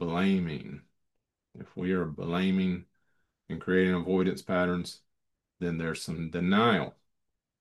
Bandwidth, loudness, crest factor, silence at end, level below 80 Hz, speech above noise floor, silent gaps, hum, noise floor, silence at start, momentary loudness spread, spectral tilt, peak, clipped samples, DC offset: 12 kHz; -29 LUFS; 20 dB; 0.7 s; -64 dBFS; 54 dB; none; none; -82 dBFS; 0 s; 16 LU; -6.5 dB/octave; -10 dBFS; under 0.1%; under 0.1%